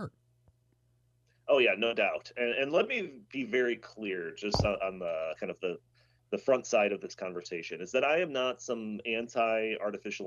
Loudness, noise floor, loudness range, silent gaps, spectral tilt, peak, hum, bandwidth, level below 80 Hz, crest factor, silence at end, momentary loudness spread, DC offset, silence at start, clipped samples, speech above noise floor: -31 LUFS; -71 dBFS; 3 LU; none; -4.5 dB/octave; -10 dBFS; none; 7.6 kHz; -58 dBFS; 22 dB; 0 s; 12 LU; under 0.1%; 0 s; under 0.1%; 39 dB